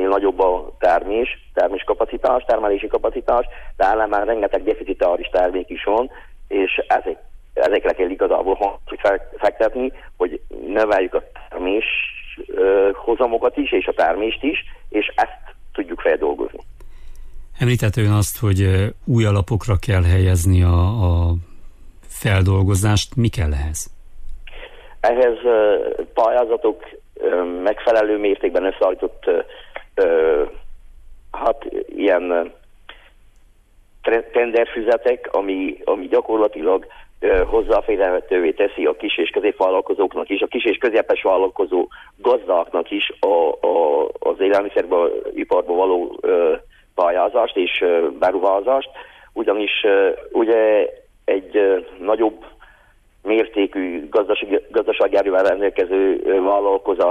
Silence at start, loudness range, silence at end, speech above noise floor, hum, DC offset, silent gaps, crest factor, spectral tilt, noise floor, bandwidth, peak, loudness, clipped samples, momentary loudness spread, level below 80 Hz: 0 s; 3 LU; 0 s; 35 dB; none; under 0.1%; none; 14 dB; -6.5 dB/octave; -53 dBFS; 15.5 kHz; -6 dBFS; -19 LUFS; under 0.1%; 8 LU; -36 dBFS